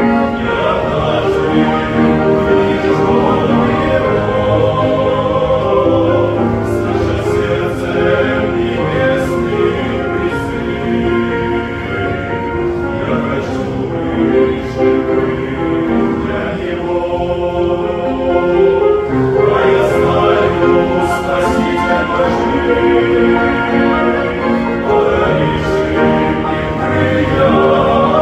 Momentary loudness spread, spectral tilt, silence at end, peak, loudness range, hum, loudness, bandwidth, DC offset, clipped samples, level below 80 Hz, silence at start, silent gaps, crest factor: 6 LU; -7.5 dB/octave; 0 s; 0 dBFS; 4 LU; none; -13 LUFS; 12.5 kHz; under 0.1%; under 0.1%; -32 dBFS; 0 s; none; 12 dB